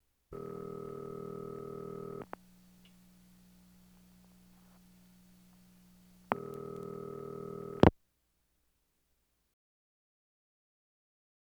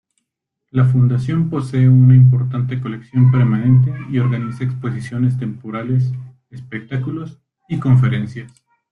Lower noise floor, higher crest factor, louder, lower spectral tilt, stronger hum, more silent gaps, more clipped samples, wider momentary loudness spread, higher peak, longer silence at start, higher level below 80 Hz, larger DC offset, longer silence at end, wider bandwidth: about the same, -78 dBFS vs -77 dBFS; first, 34 dB vs 14 dB; second, -37 LUFS vs -16 LUFS; second, -8 dB/octave vs -9.5 dB/octave; neither; neither; neither; first, 19 LU vs 16 LU; second, -6 dBFS vs -2 dBFS; second, 0.3 s vs 0.75 s; about the same, -56 dBFS vs -52 dBFS; neither; first, 3.65 s vs 0.45 s; first, over 20 kHz vs 3.9 kHz